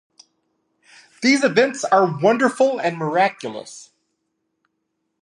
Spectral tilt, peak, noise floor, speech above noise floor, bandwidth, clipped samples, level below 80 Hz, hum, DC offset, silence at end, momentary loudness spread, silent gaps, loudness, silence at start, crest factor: -4.5 dB/octave; -2 dBFS; -75 dBFS; 56 dB; 11.5 kHz; under 0.1%; -74 dBFS; none; under 0.1%; 1.4 s; 16 LU; none; -18 LUFS; 1.2 s; 20 dB